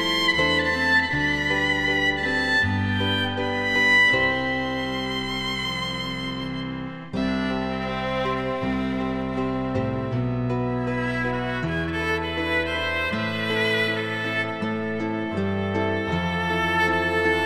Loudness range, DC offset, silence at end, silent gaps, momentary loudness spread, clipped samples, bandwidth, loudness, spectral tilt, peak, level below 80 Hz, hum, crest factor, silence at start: 6 LU; under 0.1%; 0 s; none; 7 LU; under 0.1%; 14 kHz; -23 LUFS; -5 dB/octave; -8 dBFS; -44 dBFS; none; 16 dB; 0 s